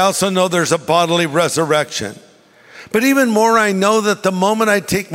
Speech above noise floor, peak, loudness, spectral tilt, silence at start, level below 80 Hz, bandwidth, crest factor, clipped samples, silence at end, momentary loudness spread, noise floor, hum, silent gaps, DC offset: 31 dB; -2 dBFS; -15 LUFS; -4 dB/octave; 0 s; -52 dBFS; 16.5 kHz; 14 dB; under 0.1%; 0 s; 4 LU; -46 dBFS; none; none; under 0.1%